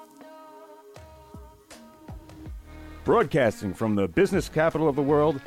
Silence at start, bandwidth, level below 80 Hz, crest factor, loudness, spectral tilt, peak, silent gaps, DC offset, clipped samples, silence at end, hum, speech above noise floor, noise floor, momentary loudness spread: 0 s; 16 kHz; -48 dBFS; 16 dB; -24 LUFS; -6.5 dB/octave; -12 dBFS; none; under 0.1%; under 0.1%; 0 s; none; 26 dB; -49 dBFS; 23 LU